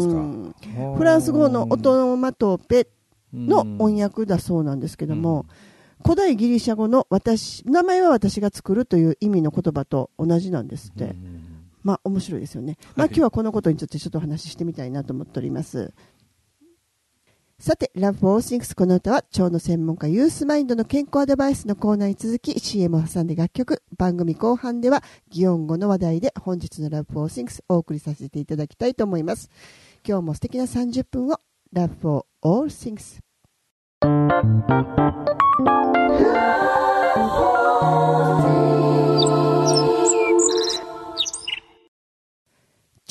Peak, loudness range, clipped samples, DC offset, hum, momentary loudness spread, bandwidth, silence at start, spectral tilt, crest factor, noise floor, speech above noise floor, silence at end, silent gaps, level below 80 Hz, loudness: -2 dBFS; 9 LU; under 0.1%; under 0.1%; none; 12 LU; 12.5 kHz; 0 s; -6 dB/octave; 18 dB; -69 dBFS; 48 dB; 1.5 s; 33.71-34.01 s; -48 dBFS; -21 LUFS